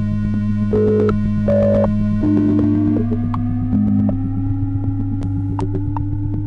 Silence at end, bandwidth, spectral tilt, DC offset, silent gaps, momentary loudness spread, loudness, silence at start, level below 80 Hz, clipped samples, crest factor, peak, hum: 0 s; 4.6 kHz; -11 dB/octave; under 0.1%; none; 6 LU; -18 LUFS; 0 s; -28 dBFS; under 0.1%; 12 dB; -4 dBFS; none